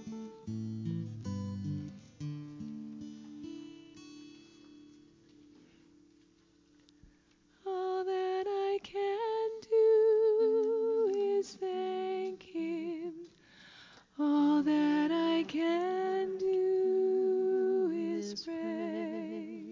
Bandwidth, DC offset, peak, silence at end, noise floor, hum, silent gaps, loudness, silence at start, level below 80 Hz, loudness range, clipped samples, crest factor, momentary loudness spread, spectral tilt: 7.6 kHz; under 0.1%; -20 dBFS; 0 s; -67 dBFS; 60 Hz at -75 dBFS; none; -32 LUFS; 0 s; -68 dBFS; 17 LU; under 0.1%; 14 dB; 19 LU; -7 dB/octave